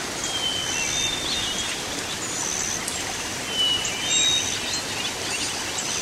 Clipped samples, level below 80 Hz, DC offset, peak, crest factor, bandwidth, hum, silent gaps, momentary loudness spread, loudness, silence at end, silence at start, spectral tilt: under 0.1%; -50 dBFS; under 0.1%; -10 dBFS; 16 dB; 16 kHz; none; none; 7 LU; -23 LUFS; 0 s; 0 s; -0.5 dB/octave